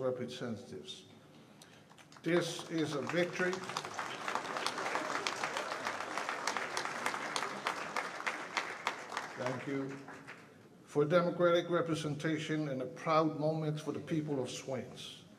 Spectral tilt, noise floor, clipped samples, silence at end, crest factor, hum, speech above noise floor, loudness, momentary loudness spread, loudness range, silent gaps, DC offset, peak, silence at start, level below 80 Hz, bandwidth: -4.5 dB/octave; -58 dBFS; under 0.1%; 0 s; 24 dB; none; 23 dB; -36 LUFS; 13 LU; 5 LU; none; under 0.1%; -12 dBFS; 0 s; -80 dBFS; 15 kHz